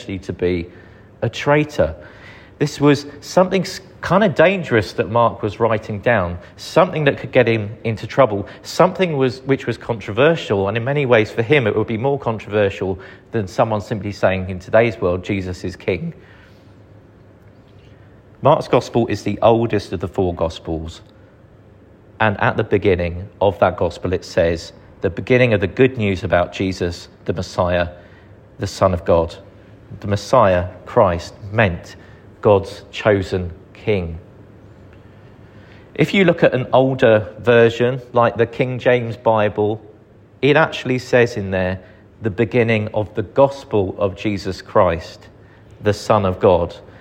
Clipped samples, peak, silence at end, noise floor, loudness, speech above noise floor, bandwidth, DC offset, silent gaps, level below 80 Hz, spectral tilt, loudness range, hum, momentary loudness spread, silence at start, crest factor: under 0.1%; 0 dBFS; 0.1 s; -46 dBFS; -18 LUFS; 29 dB; 16 kHz; under 0.1%; none; -44 dBFS; -6.5 dB/octave; 5 LU; none; 12 LU; 0 s; 18 dB